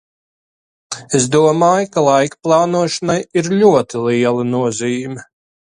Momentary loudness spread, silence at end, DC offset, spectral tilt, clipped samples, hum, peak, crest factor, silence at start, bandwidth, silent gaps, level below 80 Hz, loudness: 10 LU; 0.5 s; under 0.1%; -5 dB/octave; under 0.1%; none; 0 dBFS; 16 dB; 0.9 s; 11.5 kHz; none; -58 dBFS; -15 LUFS